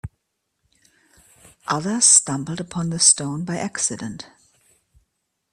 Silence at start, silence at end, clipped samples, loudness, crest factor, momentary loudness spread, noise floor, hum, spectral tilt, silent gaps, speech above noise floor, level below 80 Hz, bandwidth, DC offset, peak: 0.05 s; 1.25 s; under 0.1%; -18 LUFS; 24 dB; 21 LU; -75 dBFS; none; -2 dB/octave; none; 54 dB; -58 dBFS; 14 kHz; under 0.1%; 0 dBFS